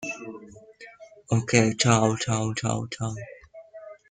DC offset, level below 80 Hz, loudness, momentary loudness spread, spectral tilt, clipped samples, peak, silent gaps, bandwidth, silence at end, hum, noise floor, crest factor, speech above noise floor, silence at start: under 0.1%; -56 dBFS; -24 LUFS; 25 LU; -4.5 dB/octave; under 0.1%; -4 dBFS; none; 9.6 kHz; 0.15 s; none; -48 dBFS; 24 dB; 24 dB; 0 s